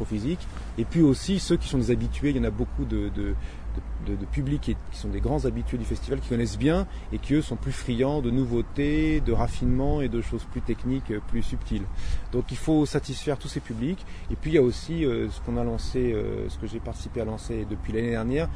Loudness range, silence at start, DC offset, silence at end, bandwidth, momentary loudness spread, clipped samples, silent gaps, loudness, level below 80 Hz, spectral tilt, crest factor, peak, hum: 4 LU; 0 s; under 0.1%; 0 s; 10.5 kHz; 10 LU; under 0.1%; none; -28 LUFS; -32 dBFS; -7 dB/octave; 16 dB; -10 dBFS; none